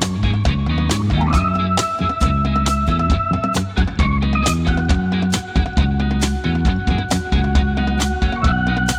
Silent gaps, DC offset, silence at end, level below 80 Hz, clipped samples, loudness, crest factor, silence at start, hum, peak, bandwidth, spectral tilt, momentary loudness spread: none; under 0.1%; 0 s; -22 dBFS; under 0.1%; -18 LUFS; 14 dB; 0 s; none; -2 dBFS; 14.5 kHz; -5.5 dB/octave; 2 LU